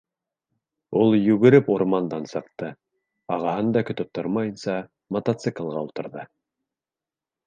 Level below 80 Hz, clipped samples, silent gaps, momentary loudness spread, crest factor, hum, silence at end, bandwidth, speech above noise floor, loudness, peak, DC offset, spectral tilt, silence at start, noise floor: -66 dBFS; under 0.1%; none; 17 LU; 22 dB; none; 1.2 s; 9 kHz; over 68 dB; -23 LUFS; -2 dBFS; under 0.1%; -8 dB/octave; 0.9 s; under -90 dBFS